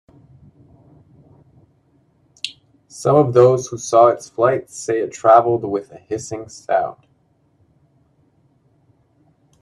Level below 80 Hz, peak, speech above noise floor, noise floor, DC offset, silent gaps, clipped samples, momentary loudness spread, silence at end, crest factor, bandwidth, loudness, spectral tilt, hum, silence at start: -60 dBFS; 0 dBFS; 44 dB; -60 dBFS; under 0.1%; none; under 0.1%; 17 LU; 2.7 s; 20 dB; 12 kHz; -17 LUFS; -6 dB/octave; none; 2.45 s